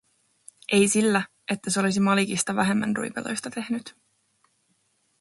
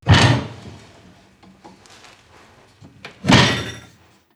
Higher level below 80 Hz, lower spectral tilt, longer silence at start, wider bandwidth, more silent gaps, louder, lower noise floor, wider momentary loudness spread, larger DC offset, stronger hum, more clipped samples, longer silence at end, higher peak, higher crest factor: second, -66 dBFS vs -40 dBFS; about the same, -4 dB/octave vs -4.5 dB/octave; first, 0.7 s vs 0.05 s; about the same, 11.5 kHz vs 12.5 kHz; neither; second, -24 LUFS vs -16 LUFS; first, -70 dBFS vs -51 dBFS; second, 11 LU vs 27 LU; neither; neither; neither; first, 1.3 s vs 0.55 s; second, -8 dBFS vs -2 dBFS; about the same, 18 dB vs 20 dB